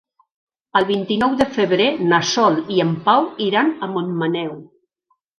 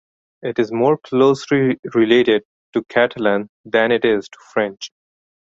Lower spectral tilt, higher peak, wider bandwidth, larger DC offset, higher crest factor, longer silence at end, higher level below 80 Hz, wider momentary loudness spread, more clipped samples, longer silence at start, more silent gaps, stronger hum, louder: about the same, -5 dB/octave vs -6 dB/octave; about the same, 0 dBFS vs -2 dBFS; first, 11 kHz vs 7.8 kHz; neither; about the same, 18 dB vs 16 dB; about the same, 0.7 s vs 0.75 s; about the same, -56 dBFS vs -60 dBFS; second, 7 LU vs 10 LU; neither; first, 0.75 s vs 0.45 s; second, none vs 1.79-1.83 s, 2.45-2.73 s, 3.49-3.64 s; neither; about the same, -18 LUFS vs -18 LUFS